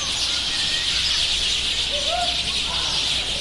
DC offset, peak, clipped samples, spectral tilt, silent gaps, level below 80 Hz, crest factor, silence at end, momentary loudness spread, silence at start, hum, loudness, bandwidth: under 0.1%; -8 dBFS; under 0.1%; -0.5 dB/octave; none; -40 dBFS; 14 dB; 0 s; 2 LU; 0 s; none; -20 LUFS; 11.5 kHz